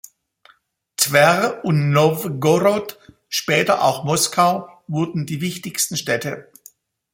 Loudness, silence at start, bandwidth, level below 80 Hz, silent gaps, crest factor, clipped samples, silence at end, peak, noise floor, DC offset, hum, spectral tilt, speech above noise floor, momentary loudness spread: -19 LUFS; 1 s; 16.5 kHz; -60 dBFS; none; 20 dB; under 0.1%; 0.7 s; 0 dBFS; -58 dBFS; under 0.1%; none; -4 dB/octave; 39 dB; 11 LU